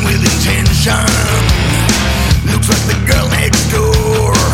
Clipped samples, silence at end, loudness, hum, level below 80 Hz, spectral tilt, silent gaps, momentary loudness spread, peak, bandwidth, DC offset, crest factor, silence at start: under 0.1%; 0 s; -11 LUFS; none; -18 dBFS; -4 dB/octave; none; 1 LU; 0 dBFS; 17 kHz; under 0.1%; 10 dB; 0 s